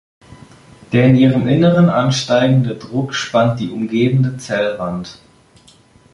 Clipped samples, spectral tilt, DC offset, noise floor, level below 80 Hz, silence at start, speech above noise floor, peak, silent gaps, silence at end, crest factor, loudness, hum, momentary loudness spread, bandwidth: under 0.1%; -6.5 dB/octave; under 0.1%; -48 dBFS; -48 dBFS; 0.3 s; 34 dB; -2 dBFS; none; 1 s; 14 dB; -15 LUFS; none; 10 LU; 11 kHz